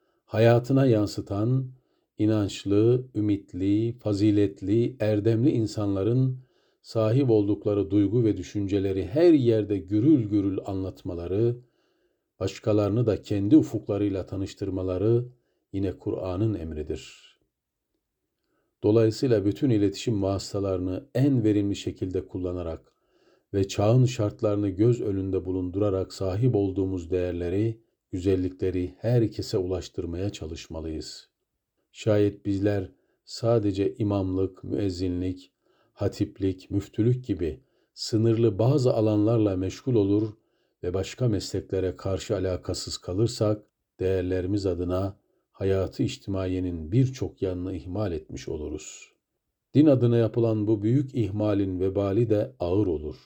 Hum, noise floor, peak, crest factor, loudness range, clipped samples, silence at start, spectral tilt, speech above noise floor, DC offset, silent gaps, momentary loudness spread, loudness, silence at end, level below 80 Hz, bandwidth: none; -82 dBFS; -8 dBFS; 18 dB; 6 LU; under 0.1%; 0.3 s; -7.5 dB/octave; 57 dB; under 0.1%; none; 12 LU; -26 LUFS; 0.1 s; -54 dBFS; 20 kHz